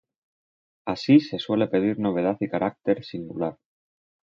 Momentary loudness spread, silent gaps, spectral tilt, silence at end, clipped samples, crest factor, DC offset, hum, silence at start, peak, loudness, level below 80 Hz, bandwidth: 12 LU; none; -7.5 dB/octave; 0.85 s; under 0.1%; 20 dB; under 0.1%; none; 0.85 s; -6 dBFS; -24 LUFS; -62 dBFS; 7.2 kHz